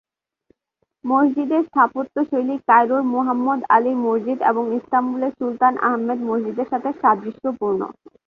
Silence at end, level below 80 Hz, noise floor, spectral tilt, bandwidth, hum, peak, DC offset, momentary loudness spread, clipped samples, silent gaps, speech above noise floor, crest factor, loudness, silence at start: 0.35 s; -68 dBFS; -73 dBFS; -8.5 dB/octave; 5 kHz; none; -2 dBFS; under 0.1%; 8 LU; under 0.1%; none; 54 dB; 18 dB; -20 LUFS; 1.05 s